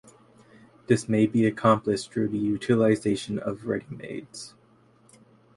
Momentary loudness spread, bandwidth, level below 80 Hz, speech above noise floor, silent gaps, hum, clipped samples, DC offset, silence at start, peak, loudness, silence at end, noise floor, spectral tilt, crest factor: 16 LU; 11.5 kHz; -60 dBFS; 34 dB; none; none; under 0.1%; under 0.1%; 0.9 s; -6 dBFS; -25 LUFS; 1.1 s; -59 dBFS; -6.5 dB/octave; 20 dB